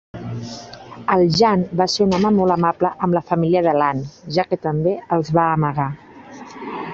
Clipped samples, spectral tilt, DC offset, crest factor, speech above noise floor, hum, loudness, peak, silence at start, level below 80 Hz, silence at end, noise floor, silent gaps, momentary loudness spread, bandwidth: under 0.1%; -6.5 dB/octave; under 0.1%; 16 dB; 21 dB; none; -18 LUFS; -2 dBFS; 0.15 s; -50 dBFS; 0 s; -38 dBFS; none; 16 LU; 8 kHz